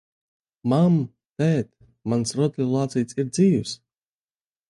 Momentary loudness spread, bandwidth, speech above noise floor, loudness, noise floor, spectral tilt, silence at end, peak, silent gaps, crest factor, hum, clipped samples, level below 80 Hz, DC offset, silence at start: 14 LU; 11.5 kHz; over 69 dB; -23 LUFS; under -90 dBFS; -7 dB/octave; 0.95 s; -8 dBFS; 1.30-1.36 s; 14 dB; none; under 0.1%; -60 dBFS; under 0.1%; 0.65 s